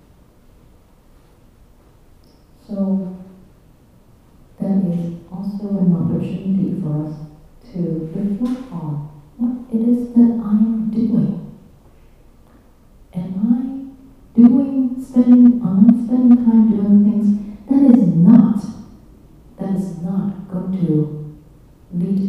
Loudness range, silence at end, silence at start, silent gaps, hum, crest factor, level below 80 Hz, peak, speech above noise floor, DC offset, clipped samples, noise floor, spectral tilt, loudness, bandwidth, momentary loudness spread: 13 LU; 0 s; 2.7 s; none; none; 18 dB; -48 dBFS; 0 dBFS; 28 dB; under 0.1%; under 0.1%; -49 dBFS; -11 dB/octave; -16 LUFS; 3.4 kHz; 18 LU